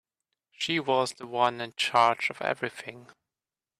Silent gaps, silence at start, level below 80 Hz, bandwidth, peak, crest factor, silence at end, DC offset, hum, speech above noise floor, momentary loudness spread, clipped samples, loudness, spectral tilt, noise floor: none; 0.6 s; -76 dBFS; 14 kHz; -8 dBFS; 22 dB; 0.75 s; under 0.1%; none; over 62 dB; 12 LU; under 0.1%; -27 LUFS; -3.5 dB/octave; under -90 dBFS